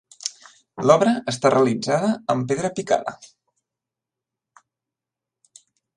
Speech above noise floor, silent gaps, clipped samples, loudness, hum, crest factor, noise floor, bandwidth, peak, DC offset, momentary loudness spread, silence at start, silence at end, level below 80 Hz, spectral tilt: 67 dB; none; under 0.1%; -21 LUFS; none; 22 dB; -87 dBFS; 11 kHz; 0 dBFS; under 0.1%; 15 LU; 0.25 s; 2.8 s; -66 dBFS; -5 dB/octave